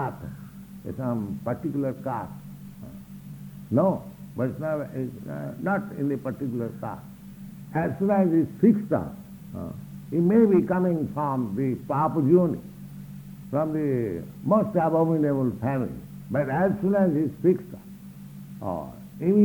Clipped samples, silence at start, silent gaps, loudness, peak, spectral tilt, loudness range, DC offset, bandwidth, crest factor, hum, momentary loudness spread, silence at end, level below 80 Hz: under 0.1%; 0 s; none; -25 LUFS; -8 dBFS; -10 dB/octave; 7 LU; under 0.1%; 19.5 kHz; 18 dB; none; 21 LU; 0 s; -56 dBFS